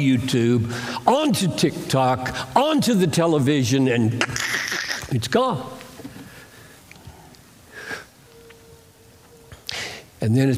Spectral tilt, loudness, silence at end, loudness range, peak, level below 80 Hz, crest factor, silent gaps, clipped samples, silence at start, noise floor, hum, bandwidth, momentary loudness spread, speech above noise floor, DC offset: -5 dB/octave; -21 LUFS; 0 s; 20 LU; -2 dBFS; -54 dBFS; 20 dB; none; under 0.1%; 0 s; -50 dBFS; none; 16 kHz; 18 LU; 30 dB; under 0.1%